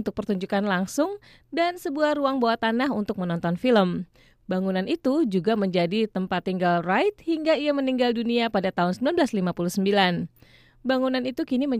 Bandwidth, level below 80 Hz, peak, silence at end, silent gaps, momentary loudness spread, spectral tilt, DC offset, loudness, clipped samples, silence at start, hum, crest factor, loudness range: 15 kHz; -60 dBFS; -8 dBFS; 0 s; none; 6 LU; -6 dB/octave; under 0.1%; -24 LUFS; under 0.1%; 0 s; none; 16 dB; 1 LU